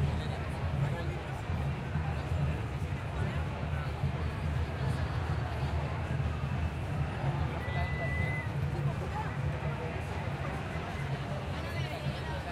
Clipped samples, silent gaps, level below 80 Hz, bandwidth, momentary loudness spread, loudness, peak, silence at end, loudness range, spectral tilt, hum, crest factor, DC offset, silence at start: under 0.1%; none; -44 dBFS; 13 kHz; 3 LU; -35 LUFS; -20 dBFS; 0 s; 2 LU; -7 dB/octave; none; 14 dB; under 0.1%; 0 s